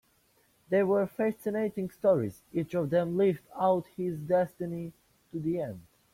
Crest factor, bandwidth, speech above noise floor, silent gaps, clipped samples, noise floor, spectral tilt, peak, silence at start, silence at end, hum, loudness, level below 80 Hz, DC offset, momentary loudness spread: 16 dB; 16.5 kHz; 39 dB; none; under 0.1%; -68 dBFS; -8.5 dB/octave; -14 dBFS; 0.7 s; 0.35 s; none; -30 LUFS; -66 dBFS; under 0.1%; 10 LU